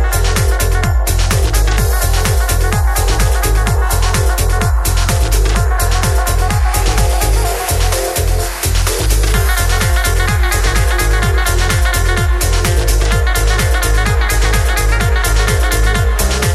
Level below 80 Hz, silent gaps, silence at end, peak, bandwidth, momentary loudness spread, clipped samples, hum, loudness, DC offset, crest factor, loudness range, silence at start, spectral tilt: -14 dBFS; none; 0 s; 0 dBFS; 15 kHz; 1 LU; under 0.1%; none; -14 LUFS; under 0.1%; 12 dB; 1 LU; 0 s; -4 dB/octave